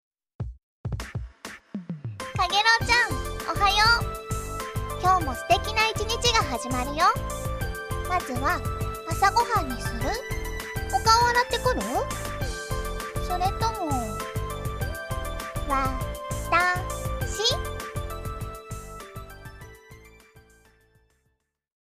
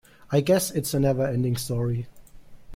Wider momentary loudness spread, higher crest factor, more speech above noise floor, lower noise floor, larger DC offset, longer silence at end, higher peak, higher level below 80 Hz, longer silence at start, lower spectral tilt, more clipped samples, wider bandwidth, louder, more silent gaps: first, 18 LU vs 7 LU; about the same, 20 dB vs 18 dB; first, 50 dB vs 21 dB; first, -74 dBFS vs -44 dBFS; neither; first, 1.55 s vs 0 s; about the same, -8 dBFS vs -8 dBFS; first, -38 dBFS vs -50 dBFS; about the same, 0.4 s vs 0.3 s; second, -3.5 dB/octave vs -6 dB/octave; neither; about the same, 15.5 kHz vs 16.5 kHz; about the same, -25 LUFS vs -25 LUFS; first, 0.63-0.84 s vs none